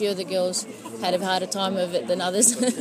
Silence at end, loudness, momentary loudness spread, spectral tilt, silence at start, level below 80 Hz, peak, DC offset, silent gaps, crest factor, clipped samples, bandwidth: 0 s; -23 LUFS; 9 LU; -2.5 dB/octave; 0 s; -76 dBFS; -2 dBFS; under 0.1%; none; 22 dB; under 0.1%; 15.5 kHz